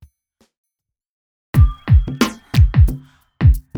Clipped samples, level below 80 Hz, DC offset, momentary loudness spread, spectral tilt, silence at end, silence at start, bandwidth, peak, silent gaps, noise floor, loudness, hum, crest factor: under 0.1%; -20 dBFS; under 0.1%; 6 LU; -7 dB/octave; 0 s; 1.55 s; 18 kHz; -2 dBFS; none; -82 dBFS; -16 LUFS; none; 14 dB